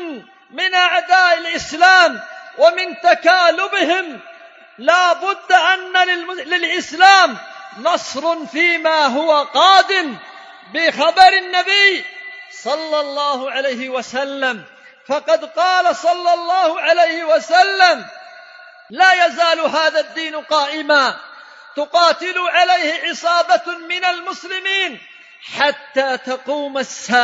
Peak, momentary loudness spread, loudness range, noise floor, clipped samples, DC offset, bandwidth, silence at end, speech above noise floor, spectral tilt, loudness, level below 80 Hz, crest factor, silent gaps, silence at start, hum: 0 dBFS; 13 LU; 5 LU; -41 dBFS; under 0.1%; under 0.1%; 9 kHz; 0 s; 26 dB; -1 dB/octave; -15 LUFS; -64 dBFS; 16 dB; none; 0 s; none